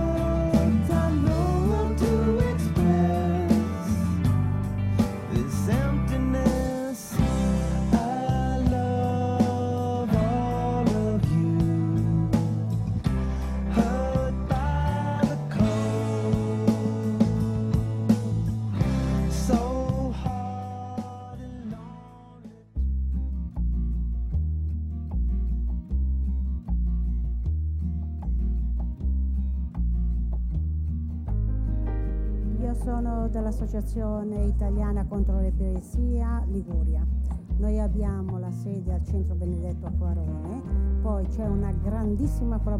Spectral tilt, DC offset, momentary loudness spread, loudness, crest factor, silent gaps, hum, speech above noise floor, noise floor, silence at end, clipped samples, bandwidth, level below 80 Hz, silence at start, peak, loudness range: -8 dB/octave; under 0.1%; 7 LU; -27 LUFS; 18 dB; none; none; 21 dB; -46 dBFS; 0 s; under 0.1%; 13.5 kHz; -30 dBFS; 0 s; -8 dBFS; 5 LU